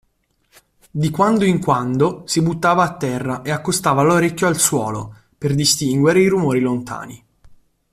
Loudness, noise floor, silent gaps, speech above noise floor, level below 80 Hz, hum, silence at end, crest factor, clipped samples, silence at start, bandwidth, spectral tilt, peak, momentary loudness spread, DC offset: -17 LUFS; -64 dBFS; none; 47 dB; -52 dBFS; none; 0.4 s; 16 dB; under 0.1%; 0.95 s; 16 kHz; -4.5 dB/octave; -2 dBFS; 11 LU; under 0.1%